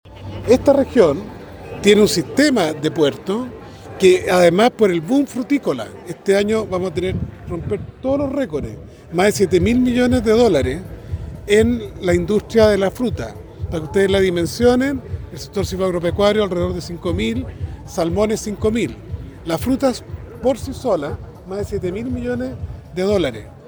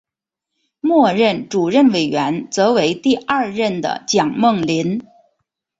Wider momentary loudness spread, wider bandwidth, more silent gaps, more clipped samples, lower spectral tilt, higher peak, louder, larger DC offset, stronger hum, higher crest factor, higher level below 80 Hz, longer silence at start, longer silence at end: first, 16 LU vs 7 LU; first, over 20 kHz vs 8 kHz; neither; neither; about the same, -5.5 dB/octave vs -5 dB/octave; about the same, 0 dBFS vs -2 dBFS; about the same, -18 LUFS vs -17 LUFS; neither; neither; about the same, 18 dB vs 16 dB; first, -36 dBFS vs -58 dBFS; second, 0.05 s vs 0.85 s; second, 0 s vs 0.8 s